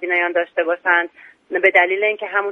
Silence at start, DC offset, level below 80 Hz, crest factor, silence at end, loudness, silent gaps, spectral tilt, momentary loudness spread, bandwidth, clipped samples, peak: 0 s; under 0.1%; -70 dBFS; 18 dB; 0 s; -17 LUFS; none; -4.5 dB/octave; 8 LU; 6 kHz; under 0.1%; 0 dBFS